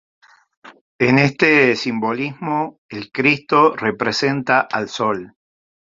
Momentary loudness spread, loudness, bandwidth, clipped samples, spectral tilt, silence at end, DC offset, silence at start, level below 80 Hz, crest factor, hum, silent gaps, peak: 10 LU; -17 LUFS; 7.6 kHz; under 0.1%; -5.5 dB/octave; 0.7 s; under 0.1%; 0.65 s; -60 dBFS; 18 dB; none; 0.81-0.99 s, 2.78-2.89 s; -2 dBFS